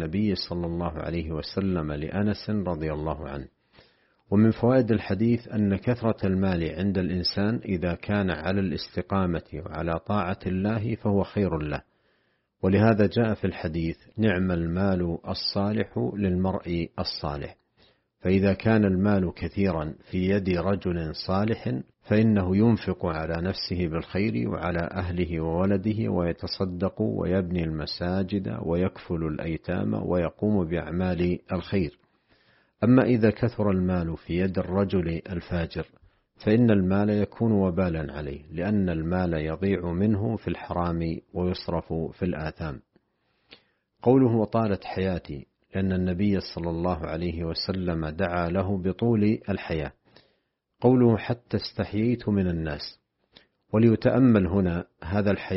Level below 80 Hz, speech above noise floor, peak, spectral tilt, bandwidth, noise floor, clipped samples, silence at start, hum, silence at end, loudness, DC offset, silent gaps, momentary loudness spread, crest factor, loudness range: -46 dBFS; 48 dB; -6 dBFS; -6.5 dB/octave; 5.8 kHz; -74 dBFS; under 0.1%; 0 s; none; 0 s; -26 LUFS; under 0.1%; none; 10 LU; 20 dB; 3 LU